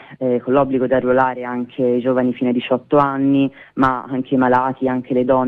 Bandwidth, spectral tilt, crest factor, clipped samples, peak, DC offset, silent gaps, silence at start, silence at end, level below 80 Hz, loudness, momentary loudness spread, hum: 4.3 kHz; -9 dB/octave; 14 dB; under 0.1%; -2 dBFS; under 0.1%; none; 0.1 s; 0 s; -50 dBFS; -18 LUFS; 6 LU; none